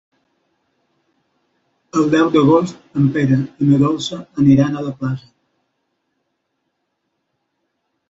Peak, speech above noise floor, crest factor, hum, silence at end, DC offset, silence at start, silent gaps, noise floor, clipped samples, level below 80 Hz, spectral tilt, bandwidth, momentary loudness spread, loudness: -2 dBFS; 57 dB; 16 dB; none; 2.9 s; under 0.1%; 1.95 s; none; -72 dBFS; under 0.1%; -54 dBFS; -7.5 dB/octave; 7.8 kHz; 11 LU; -16 LUFS